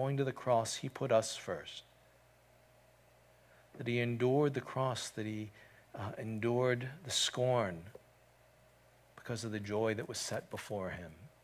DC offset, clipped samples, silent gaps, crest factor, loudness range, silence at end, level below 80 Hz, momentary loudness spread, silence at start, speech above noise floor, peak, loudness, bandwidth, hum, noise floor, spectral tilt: under 0.1%; under 0.1%; none; 20 dB; 5 LU; 0.15 s; -68 dBFS; 15 LU; 0 s; 30 dB; -18 dBFS; -36 LUFS; 16 kHz; none; -65 dBFS; -4.5 dB/octave